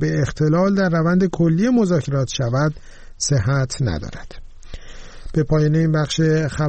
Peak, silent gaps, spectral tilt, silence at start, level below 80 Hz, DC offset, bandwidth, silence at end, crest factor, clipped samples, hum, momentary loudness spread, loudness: -8 dBFS; none; -6 dB/octave; 0 s; -36 dBFS; under 0.1%; 8.8 kHz; 0 s; 12 dB; under 0.1%; none; 8 LU; -19 LUFS